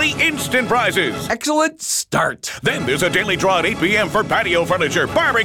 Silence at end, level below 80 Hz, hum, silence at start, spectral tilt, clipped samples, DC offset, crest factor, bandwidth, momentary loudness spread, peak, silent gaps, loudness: 0 s; -46 dBFS; none; 0 s; -3 dB/octave; under 0.1%; under 0.1%; 12 dB; 19 kHz; 4 LU; -6 dBFS; none; -17 LUFS